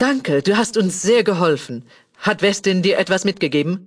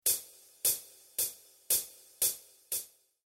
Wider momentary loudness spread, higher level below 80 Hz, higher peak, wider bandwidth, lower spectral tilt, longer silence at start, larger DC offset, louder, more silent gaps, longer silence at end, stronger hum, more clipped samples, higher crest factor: second, 7 LU vs 15 LU; first, -60 dBFS vs -74 dBFS; first, -2 dBFS vs -14 dBFS; second, 11 kHz vs 19 kHz; first, -4.5 dB/octave vs 1.5 dB/octave; about the same, 0 s vs 0.05 s; neither; first, -18 LUFS vs -32 LUFS; neither; second, 0.05 s vs 0.4 s; neither; neither; second, 16 dB vs 22 dB